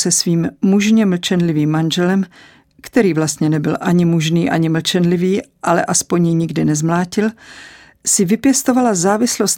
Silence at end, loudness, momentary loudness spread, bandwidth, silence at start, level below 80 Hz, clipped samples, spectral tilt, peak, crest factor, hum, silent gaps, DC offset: 0 s; -15 LUFS; 5 LU; 17 kHz; 0 s; -54 dBFS; under 0.1%; -4.5 dB/octave; 0 dBFS; 14 dB; none; none; under 0.1%